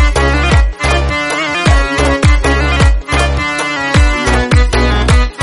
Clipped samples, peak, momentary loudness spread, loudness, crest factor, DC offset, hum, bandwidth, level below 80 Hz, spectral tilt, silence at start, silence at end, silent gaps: under 0.1%; 0 dBFS; 3 LU; -12 LUFS; 10 dB; under 0.1%; none; 11.5 kHz; -14 dBFS; -5 dB/octave; 0 s; 0 s; none